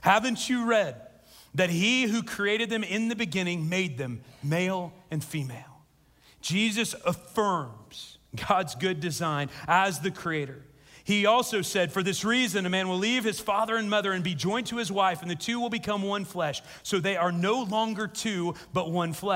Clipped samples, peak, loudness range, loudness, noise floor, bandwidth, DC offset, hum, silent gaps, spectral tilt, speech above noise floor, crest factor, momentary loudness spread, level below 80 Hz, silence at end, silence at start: under 0.1%; -8 dBFS; 5 LU; -28 LUFS; -60 dBFS; 16 kHz; under 0.1%; none; none; -4 dB/octave; 33 dB; 20 dB; 11 LU; -64 dBFS; 0 s; 0 s